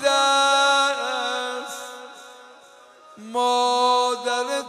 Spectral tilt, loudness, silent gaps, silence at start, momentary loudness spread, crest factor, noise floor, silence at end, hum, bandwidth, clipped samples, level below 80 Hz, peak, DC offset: 0.5 dB/octave; -20 LUFS; none; 0 s; 17 LU; 16 dB; -49 dBFS; 0 s; none; 15.5 kHz; under 0.1%; -82 dBFS; -6 dBFS; under 0.1%